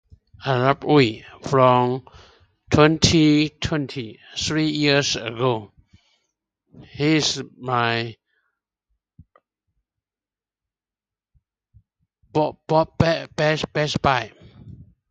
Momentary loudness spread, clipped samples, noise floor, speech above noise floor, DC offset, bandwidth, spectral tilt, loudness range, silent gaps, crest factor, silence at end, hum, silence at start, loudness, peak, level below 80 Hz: 13 LU; under 0.1%; under -90 dBFS; over 70 dB; under 0.1%; 9.2 kHz; -5 dB/octave; 10 LU; none; 22 dB; 0.3 s; none; 0.4 s; -20 LUFS; 0 dBFS; -46 dBFS